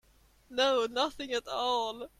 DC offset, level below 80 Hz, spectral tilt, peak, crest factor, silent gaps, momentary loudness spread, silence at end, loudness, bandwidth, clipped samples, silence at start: under 0.1%; -64 dBFS; -1.5 dB/octave; -14 dBFS; 18 dB; none; 7 LU; 0.1 s; -31 LUFS; 14.5 kHz; under 0.1%; 0.5 s